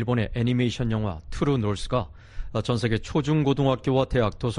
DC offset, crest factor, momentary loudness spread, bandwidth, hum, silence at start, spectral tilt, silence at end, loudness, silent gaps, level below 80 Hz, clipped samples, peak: under 0.1%; 16 dB; 7 LU; 10.5 kHz; none; 0 s; -7 dB/octave; 0 s; -25 LUFS; none; -38 dBFS; under 0.1%; -8 dBFS